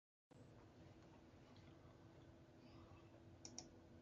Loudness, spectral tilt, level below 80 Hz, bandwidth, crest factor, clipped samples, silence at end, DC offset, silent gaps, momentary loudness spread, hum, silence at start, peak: -64 LUFS; -4 dB/octave; -76 dBFS; 8.2 kHz; 28 dB; under 0.1%; 0 s; under 0.1%; none; 9 LU; none; 0.3 s; -36 dBFS